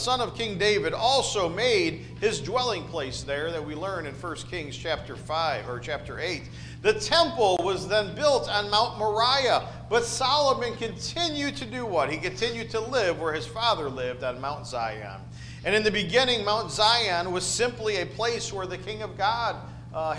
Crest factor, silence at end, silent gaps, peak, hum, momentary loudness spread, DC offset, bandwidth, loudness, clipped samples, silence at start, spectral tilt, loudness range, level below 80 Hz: 18 dB; 0 s; none; -8 dBFS; none; 11 LU; under 0.1%; 10.5 kHz; -26 LUFS; under 0.1%; 0 s; -3.5 dB/octave; 6 LU; -50 dBFS